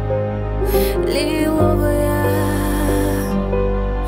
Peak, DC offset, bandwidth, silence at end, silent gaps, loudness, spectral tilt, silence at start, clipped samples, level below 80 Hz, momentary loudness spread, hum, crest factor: -4 dBFS; under 0.1%; 16.5 kHz; 0 s; none; -18 LUFS; -6.5 dB/octave; 0 s; under 0.1%; -24 dBFS; 5 LU; none; 14 dB